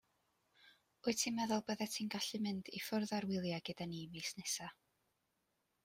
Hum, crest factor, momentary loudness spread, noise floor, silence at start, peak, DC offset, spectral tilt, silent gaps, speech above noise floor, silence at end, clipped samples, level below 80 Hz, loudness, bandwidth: none; 22 dB; 8 LU; -84 dBFS; 0.65 s; -22 dBFS; under 0.1%; -3.5 dB/octave; none; 43 dB; 1.1 s; under 0.1%; -80 dBFS; -41 LUFS; 16 kHz